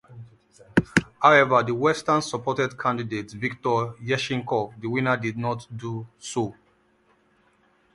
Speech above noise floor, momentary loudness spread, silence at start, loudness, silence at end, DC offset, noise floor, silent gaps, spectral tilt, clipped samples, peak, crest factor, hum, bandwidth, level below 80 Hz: 39 dB; 14 LU; 0.1 s; -24 LUFS; 1.45 s; under 0.1%; -63 dBFS; none; -5.5 dB/octave; under 0.1%; 0 dBFS; 24 dB; none; 11.5 kHz; -56 dBFS